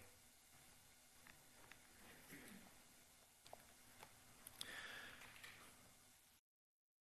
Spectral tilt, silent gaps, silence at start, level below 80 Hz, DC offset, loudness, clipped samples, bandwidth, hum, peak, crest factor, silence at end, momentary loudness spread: -1.5 dB/octave; none; 0 s; -82 dBFS; under 0.1%; -60 LUFS; under 0.1%; 13 kHz; none; -28 dBFS; 34 dB; 0.6 s; 14 LU